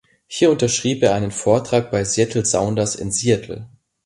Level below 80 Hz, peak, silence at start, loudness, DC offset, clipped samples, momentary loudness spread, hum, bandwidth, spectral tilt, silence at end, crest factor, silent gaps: -48 dBFS; -2 dBFS; 0.3 s; -18 LUFS; under 0.1%; under 0.1%; 5 LU; none; 11.5 kHz; -4.5 dB/octave; 0.4 s; 18 dB; none